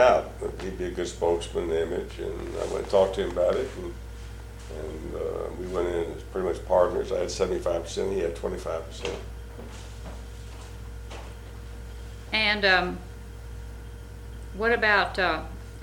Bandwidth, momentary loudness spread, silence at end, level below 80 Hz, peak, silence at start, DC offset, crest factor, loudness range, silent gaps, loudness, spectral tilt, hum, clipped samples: 17 kHz; 20 LU; 0 s; -40 dBFS; -6 dBFS; 0 s; under 0.1%; 22 dB; 9 LU; none; -27 LUFS; -4.5 dB/octave; none; under 0.1%